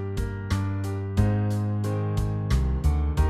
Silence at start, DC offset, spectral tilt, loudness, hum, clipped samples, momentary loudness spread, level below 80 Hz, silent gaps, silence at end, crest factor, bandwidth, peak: 0 s; under 0.1%; -7.5 dB/octave; -27 LUFS; none; under 0.1%; 5 LU; -28 dBFS; none; 0 s; 16 dB; 13.5 kHz; -10 dBFS